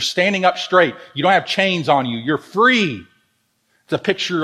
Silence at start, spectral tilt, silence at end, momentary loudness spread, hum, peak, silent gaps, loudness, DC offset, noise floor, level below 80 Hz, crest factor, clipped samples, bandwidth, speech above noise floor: 0 s; -4.5 dB/octave; 0 s; 8 LU; none; 0 dBFS; none; -17 LUFS; under 0.1%; -65 dBFS; -64 dBFS; 18 dB; under 0.1%; 14.5 kHz; 48 dB